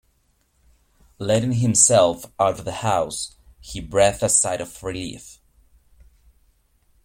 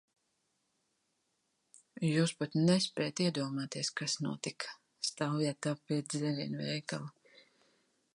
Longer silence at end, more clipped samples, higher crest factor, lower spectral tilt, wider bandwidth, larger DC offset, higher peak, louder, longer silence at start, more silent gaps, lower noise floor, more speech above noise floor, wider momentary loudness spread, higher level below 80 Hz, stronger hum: first, 1.7 s vs 1.05 s; neither; about the same, 24 dB vs 20 dB; second, -3.5 dB/octave vs -5 dB/octave; first, 16.5 kHz vs 11.5 kHz; neither; first, 0 dBFS vs -16 dBFS; first, -20 LUFS vs -35 LUFS; second, 1.2 s vs 1.95 s; neither; second, -65 dBFS vs -80 dBFS; about the same, 44 dB vs 46 dB; first, 19 LU vs 11 LU; first, -48 dBFS vs -78 dBFS; neither